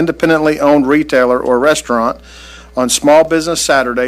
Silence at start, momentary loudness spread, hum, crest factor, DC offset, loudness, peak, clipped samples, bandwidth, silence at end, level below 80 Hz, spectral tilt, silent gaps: 0 s; 8 LU; none; 12 dB; under 0.1%; -12 LUFS; 0 dBFS; under 0.1%; 16 kHz; 0 s; -40 dBFS; -3.5 dB/octave; none